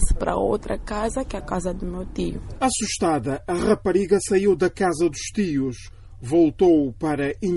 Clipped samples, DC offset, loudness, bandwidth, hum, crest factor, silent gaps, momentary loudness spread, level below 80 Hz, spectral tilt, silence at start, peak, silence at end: under 0.1%; under 0.1%; -23 LUFS; 11.5 kHz; none; 16 dB; none; 10 LU; -34 dBFS; -5.5 dB/octave; 0 s; -6 dBFS; 0 s